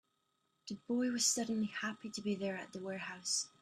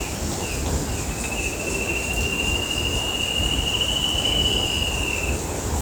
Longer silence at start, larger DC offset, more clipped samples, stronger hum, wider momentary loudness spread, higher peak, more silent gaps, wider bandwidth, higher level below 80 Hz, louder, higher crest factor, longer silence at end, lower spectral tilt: first, 0.65 s vs 0 s; neither; neither; neither; first, 13 LU vs 7 LU; second, -20 dBFS vs -8 dBFS; neither; second, 14 kHz vs over 20 kHz; second, -80 dBFS vs -32 dBFS; second, -37 LUFS vs -22 LUFS; about the same, 20 dB vs 16 dB; first, 0.15 s vs 0 s; about the same, -2.5 dB/octave vs -2.5 dB/octave